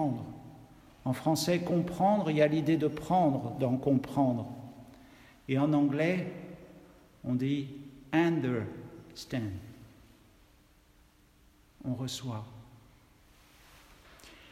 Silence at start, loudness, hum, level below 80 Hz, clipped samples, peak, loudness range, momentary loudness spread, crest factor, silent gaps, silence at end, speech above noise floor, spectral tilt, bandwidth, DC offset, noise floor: 0 s; -31 LUFS; none; -62 dBFS; under 0.1%; -12 dBFS; 14 LU; 21 LU; 20 dB; none; 0.15 s; 33 dB; -6.5 dB/octave; 16 kHz; under 0.1%; -63 dBFS